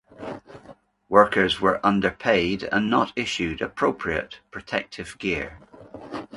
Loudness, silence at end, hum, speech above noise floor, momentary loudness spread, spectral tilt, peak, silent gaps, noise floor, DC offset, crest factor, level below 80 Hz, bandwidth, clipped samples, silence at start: -23 LUFS; 0 s; none; 27 dB; 18 LU; -5 dB/octave; 0 dBFS; none; -50 dBFS; under 0.1%; 24 dB; -50 dBFS; 11.5 kHz; under 0.1%; 0.2 s